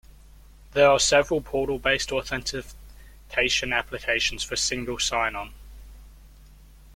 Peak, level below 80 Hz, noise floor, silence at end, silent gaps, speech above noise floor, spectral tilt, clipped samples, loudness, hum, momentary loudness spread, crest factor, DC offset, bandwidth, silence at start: -6 dBFS; -44 dBFS; -49 dBFS; 0.4 s; none; 25 dB; -2 dB/octave; under 0.1%; -24 LUFS; none; 12 LU; 20 dB; under 0.1%; 16.5 kHz; 0.7 s